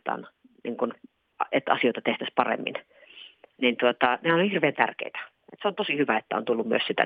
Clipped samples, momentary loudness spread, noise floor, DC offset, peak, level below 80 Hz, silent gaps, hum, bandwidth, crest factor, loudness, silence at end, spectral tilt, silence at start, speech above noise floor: under 0.1%; 15 LU; -50 dBFS; under 0.1%; -4 dBFS; -80 dBFS; none; none; 4.9 kHz; 24 dB; -26 LUFS; 0 s; -8 dB/octave; 0.05 s; 24 dB